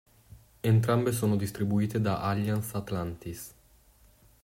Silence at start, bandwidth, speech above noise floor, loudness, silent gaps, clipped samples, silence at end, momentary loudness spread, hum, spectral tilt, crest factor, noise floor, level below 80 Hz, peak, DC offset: 0.65 s; 16 kHz; 32 dB; -29 LUFS; none; under 0.1%; 0.95 s; 15 LU; none; -7 dB/octave; 18 dB; -60 dBFS; -58 dBFS; -12 dBFS; under 0.1%